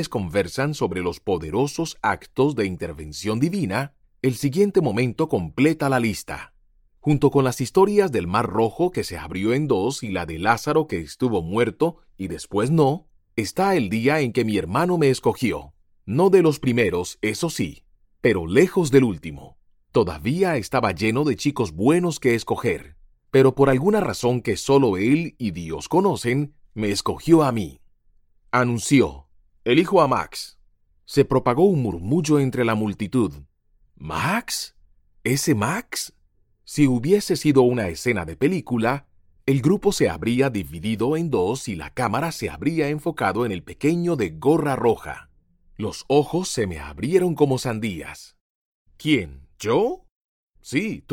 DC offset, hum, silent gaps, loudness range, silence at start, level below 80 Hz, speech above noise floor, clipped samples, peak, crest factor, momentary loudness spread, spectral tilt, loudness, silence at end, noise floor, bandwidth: under 0.1%; none; 48.41-48.86 s, 50.11-50.54 s; 4 LU; 0 s; -48 dBFS; 40 dB; under 0.1%; -2 dBFS; 20 dB; 12 LU; -6 dB/octave; -22 LUFS; 0 s; -61 dBFS; 17 kHz